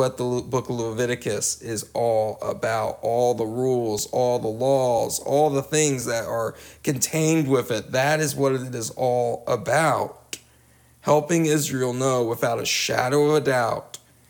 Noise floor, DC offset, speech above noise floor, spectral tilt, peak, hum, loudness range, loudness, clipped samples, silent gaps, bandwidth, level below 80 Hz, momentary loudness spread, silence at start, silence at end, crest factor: -56 dBFS; under 0.1%; 33 dB; -4.5 dB/octave; -6 dBFS; none; 2 LU; -23 LUFS; under 0.1%; none; 19.5 kHz; -58 dBFS; 8 LU; 0 s; 0.45 s; 18 dB